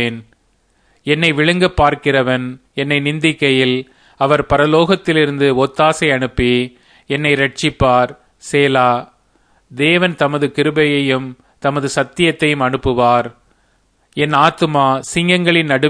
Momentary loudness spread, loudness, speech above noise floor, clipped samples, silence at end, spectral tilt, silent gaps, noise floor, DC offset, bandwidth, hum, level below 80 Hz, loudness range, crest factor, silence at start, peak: 9 LU; -14 LUFS; 44 dB; under 0.1%; 0 s; -5.5 dB/octave; none; -58 dBFS; under 0.1%; 10.5 kHz; none; -40 dBFS; 2 LU; 16 dB; 0 s; 0 dBFS